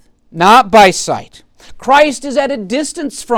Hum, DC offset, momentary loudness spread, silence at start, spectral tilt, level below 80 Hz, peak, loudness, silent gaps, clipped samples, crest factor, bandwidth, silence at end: none; under 0.1%; 16 LU; 0.35 s; -3.5 dB/octave; -44 dBFS; 0 dBFS; -11 LUFS; none; under 0.1%; 12 dB; 18 kHz; 0 s